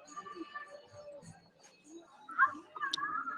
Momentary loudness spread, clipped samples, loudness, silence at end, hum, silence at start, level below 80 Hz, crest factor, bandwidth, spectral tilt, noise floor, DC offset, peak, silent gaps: 24 LU; under 0.1%; -36 LUFS; 0 s; none; 0 s; -84 dBFS; 24 dB; 12 kHz; -2 dB/octave; -63 dBFS; under 0.1%; -16 dBFS; none